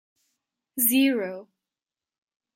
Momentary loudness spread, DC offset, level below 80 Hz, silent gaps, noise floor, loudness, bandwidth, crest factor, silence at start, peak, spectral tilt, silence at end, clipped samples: 18 LU; under 0.1%; -78 dBFS; none; under -90 dBFS; -22 LUFS; 16.5 kHz; 22 dB; 0.75 s; -8 dBFS; -2 dB/octave; 1.1 s; under 0.1%